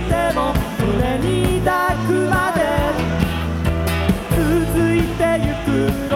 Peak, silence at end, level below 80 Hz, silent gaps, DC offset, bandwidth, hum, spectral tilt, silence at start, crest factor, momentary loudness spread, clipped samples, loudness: -2 dBFS; 0 s; -28 dBFS; none; under 0.1%; 17 kHz; none; -6.5 dB/octave; 0 s; 16 dB; 3 LU; under 0.1%; -18 LUFS